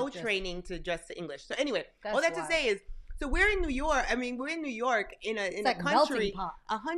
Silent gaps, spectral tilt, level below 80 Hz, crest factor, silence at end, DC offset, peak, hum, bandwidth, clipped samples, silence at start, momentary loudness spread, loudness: none; -3.5 dB/octave; -42 dBFS; 18 dB; 0 s; under 0.1%; -12 dBFS; none; 12.5 kHz; under 0.1%; 0 s; 11 LU; -31 LUFS